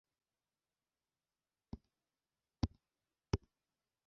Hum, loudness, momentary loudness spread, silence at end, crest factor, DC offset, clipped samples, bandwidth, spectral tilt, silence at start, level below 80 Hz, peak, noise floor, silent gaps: none; -44 LUFS; 13 LU; 0.7 s; 30 dB; under 0.1%; under 0.1%; 5.8 kHz; -7 dB/octave; 1.75 s; -56 dBFS; -20 dBFS; under -90 dBFS; none